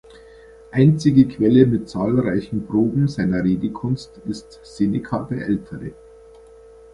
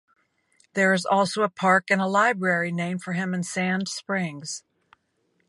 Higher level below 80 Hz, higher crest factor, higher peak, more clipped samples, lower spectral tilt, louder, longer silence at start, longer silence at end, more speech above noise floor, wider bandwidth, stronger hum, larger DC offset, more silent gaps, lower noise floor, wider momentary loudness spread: first, -48 dBFS vs -72 dBFS; about the same, 18 dB vs 20 dB; first, -2 dBFS vs -6 dBFS; neither; first, -8.5 dB/octave vs -4.5 dB/octave; first, -19 LUFS vs -24 LUFS; about the same, 0.75 s vs 0.75 s; about the same, 1 s vs 0.9 s; second, 26 dB vs 47 dB; about the same, 11 kHz vs 11.5 kHz; neither; neither; neither; second, -45 dBFS vs -71 dBFS; first, 16 LU vs 10 LU